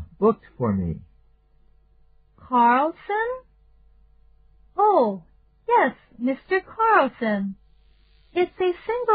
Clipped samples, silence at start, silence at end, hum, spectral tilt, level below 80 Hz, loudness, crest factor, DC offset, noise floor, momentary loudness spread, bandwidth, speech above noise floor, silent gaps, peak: under 0.1%; 0 s; 0 s; none; -5 dB/octave; -54 dBFS; -23 LUFS; 18 dB; under 0.1%; -57 dBFS; 13 LU; 5 kHz; 36 dB; none; -6 dBFS